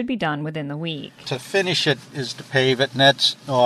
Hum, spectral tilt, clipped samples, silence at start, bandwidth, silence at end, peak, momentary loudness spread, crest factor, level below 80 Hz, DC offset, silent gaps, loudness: none; -4 dB/octave; under 0.1%; 0 s; 13.5 kHz; 0 s; 0 dBFS; 14 LU; 20 dB; -62 dBFS; under 0.1%; none; -21 LUFS